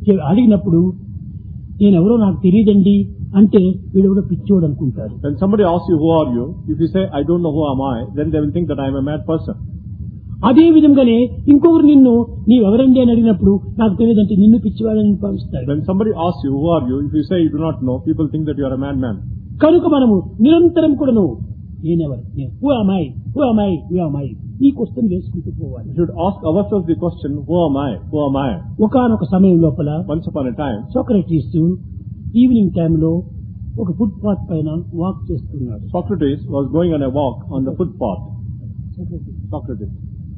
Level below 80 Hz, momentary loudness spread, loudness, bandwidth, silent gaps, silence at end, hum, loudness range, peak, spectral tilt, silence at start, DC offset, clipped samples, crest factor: -36 dBFS; 16 LU; -15 LUFS; 4.6 kHz; none; 0 s; none; 8 LU; 0 dBFS; -12.5 dB/octave; 0 s; under 0.1%; under 0.1%; 14 dB